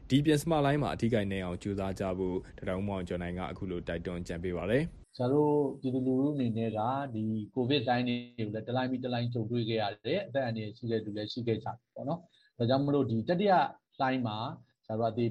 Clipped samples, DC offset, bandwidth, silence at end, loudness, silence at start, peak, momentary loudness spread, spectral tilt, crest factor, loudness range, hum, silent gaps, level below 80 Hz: under 0.1%; under 0.1%; 12 kHz; 0 s; -32 LUFS; 0 s; -14 dBFS; 10 LU; -7 dB/octave; 16 dB; 4 LU; none; none; -56 dBFS